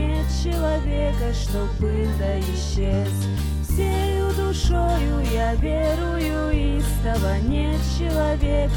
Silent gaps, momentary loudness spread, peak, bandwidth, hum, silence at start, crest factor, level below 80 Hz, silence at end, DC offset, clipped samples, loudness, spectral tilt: none; 3 LU; -6 dBFS; 19 kHz; none; 0 s; 14 dB; -24 dBFS; 0 s; under 0.1%; under 0.1%; -23 LUFS; -6.5 dB/octave